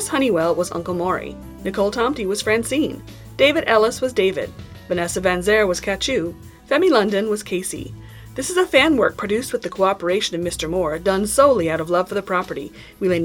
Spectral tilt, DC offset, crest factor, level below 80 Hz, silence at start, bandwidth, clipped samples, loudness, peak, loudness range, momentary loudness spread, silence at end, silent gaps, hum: -4 dB/octave; under 0.1%; 18 dB; -44 dBFS; 0 s; 18.5 kHz; under 0.1%; -19 LUFS; -2 dBFS; 2 LU; 14 LU; 0 s; none; none